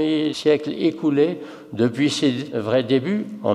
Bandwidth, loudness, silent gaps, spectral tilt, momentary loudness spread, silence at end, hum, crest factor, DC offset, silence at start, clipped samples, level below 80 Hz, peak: 12 kHz; -21 LUFS; none; -6 dB/octave; 6 LU; 0 s; none; 14 dB; under 0.1%; 0 s; under 0.1%; -68 dBFS; -6 dBFS